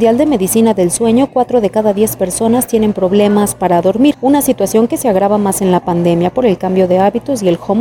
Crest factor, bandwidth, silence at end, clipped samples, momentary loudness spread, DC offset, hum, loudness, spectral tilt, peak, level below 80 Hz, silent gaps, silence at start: 10 dB; 19 kHz; 0 s; under 0.1%; 3 LU; under 0.1%; none; -12 LUFS; -5.5 dB/octave; 0 dBFS; -42 dBFS; none; 0 s